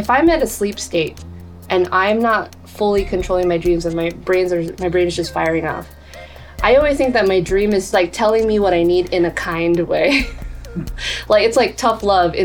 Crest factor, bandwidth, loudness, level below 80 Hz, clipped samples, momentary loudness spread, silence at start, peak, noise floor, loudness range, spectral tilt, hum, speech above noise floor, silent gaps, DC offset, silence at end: 16 dB; 18.5 kHz; -17 LUFS; -34 dBFS; under 0.1%; 15 LU; 0 s; 0 dBFS; -36 dBFS; 3 LU; -5 dB/octave; none; 20 dB; none; under 0.1%; 0 s